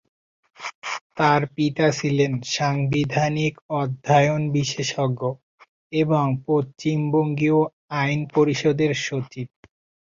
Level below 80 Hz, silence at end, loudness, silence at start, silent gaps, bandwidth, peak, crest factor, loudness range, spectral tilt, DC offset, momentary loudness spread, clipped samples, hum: -58 dBFS; 0.65 s; -22 LUFS; 0.6 s; 0.75-0.82 s, 1.01-1.10 s, 3.62-3.69 s, 5.43-5.58 s, 5.68-5.90 s, 7.73-7.88 s; 7.6 kHz; -4 dBFS; 18 dB; 1 LU; -6 dB/octave; under 0.1%; 10 LU; under 0.1%; none